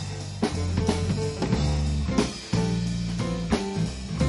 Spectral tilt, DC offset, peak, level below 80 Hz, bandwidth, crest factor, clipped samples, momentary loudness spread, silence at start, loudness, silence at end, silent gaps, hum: -6 dB/octave; under 0.1%; -8 dBFS; -34 dBFS; 11.5 kHz; 18 dB; under 0.1%; 4 LU; 0 s; -27 LUFS; 0 s; none; none